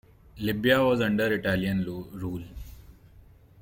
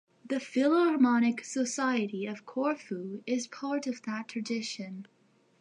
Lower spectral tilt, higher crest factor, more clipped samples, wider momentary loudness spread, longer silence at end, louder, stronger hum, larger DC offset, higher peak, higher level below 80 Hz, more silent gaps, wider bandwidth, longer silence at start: first, -6.5 dB/octave vs -4.5 dB/octave; about the same, 20 dB vs 16 dB; neither; first, 19 LU vs 13 LU; second, 0.4 s vs 0.55 s; first, -26 LUFS vs -31 LUFS; neither; neither; first, -8 dBFS vs -14 dBFS; first, -50 dBFS vs -86 dBFS; neither; first, 17 kHz vs 10.5 kHz; about the same, 0.35 s vs 0.25 s